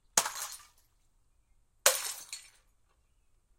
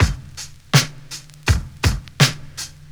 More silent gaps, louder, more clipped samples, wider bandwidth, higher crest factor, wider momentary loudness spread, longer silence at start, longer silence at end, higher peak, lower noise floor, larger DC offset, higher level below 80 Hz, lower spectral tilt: neither; second, -31 LUFS vs -20 LUFS; neither; second, 16.5 kHz vs over 20 kHz; first, 32 dB vs 20 dB; about the same, 18 LU vs 17 LU; first, 0.15 s vs 0 s; first, 1.1 s vs 0.25 s; second, -6 dBFS vs 0 dBFS; first, -70 dBFS vs -37 dBFS; neither; second, -70 dBFS vs -30 dBFS; second, 1.5 dB/octave vs -4 dB/octave